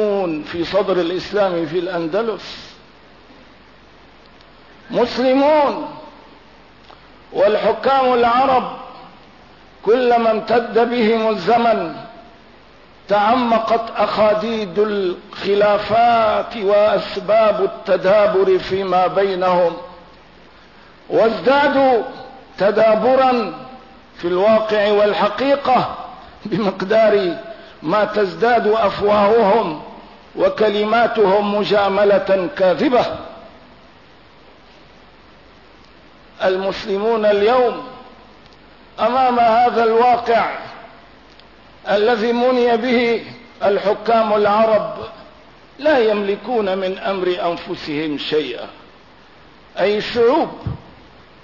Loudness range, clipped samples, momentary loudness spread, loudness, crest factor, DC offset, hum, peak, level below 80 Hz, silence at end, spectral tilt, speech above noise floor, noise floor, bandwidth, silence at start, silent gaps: 6 LU; under 0.1%; 15 LU; -16 LUFS; 12 dB; 0.2%; none; -6 dBFS; -52 dBFS; 0.6 s; -6.5 dB/octave; 30 dB; -46 dBFS; 6 kHz; 0 s; none